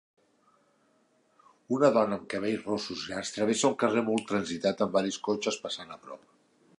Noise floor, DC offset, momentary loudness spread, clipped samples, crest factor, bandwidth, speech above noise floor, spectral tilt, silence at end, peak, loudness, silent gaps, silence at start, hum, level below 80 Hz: -68 dBFS; under 0.1%; 13 LU; under 0.1%; 22 dB; 11.5 kHz; 39 dB; -4 dB/octave; 0.65 s; -10 dBFS; -29 LUFS; none; 1.7 s; none; -70 dBFS